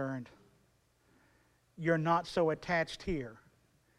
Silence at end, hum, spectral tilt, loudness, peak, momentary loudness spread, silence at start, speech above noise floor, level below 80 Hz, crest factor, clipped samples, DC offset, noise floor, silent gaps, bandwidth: 0.65 s; none; -6.5 dB/octave; -34 LUFS; -16 dBFS; 14 LU; 0 s; 38 dB; -58 dBFS; 20 dB; under 0.1%; under 0.1%; -71 dBFS; none; 12 kHz